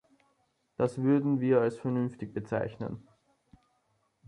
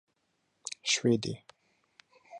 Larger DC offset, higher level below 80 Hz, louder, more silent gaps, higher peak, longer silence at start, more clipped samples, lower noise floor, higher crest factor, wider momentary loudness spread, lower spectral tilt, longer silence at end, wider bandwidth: neither; first, -66 dBFS vs -72 dBFS; about the same, -30 LUFS vs -30 LUFS; neither; about the same, -14 dBFS vs -14 dBFS; first, 0.8 s vs 0.65 s; neither; about the same, -74 dBFS vs -77 dBFS; about the same, 18 dB vs 20 dB; second, 14 LU vs 18 LU; first, -9 dB/octave vs -3.5 dB/octave; first, 1.25 s vs 0 s; about the same, 10.5 kHz vs 11 kHz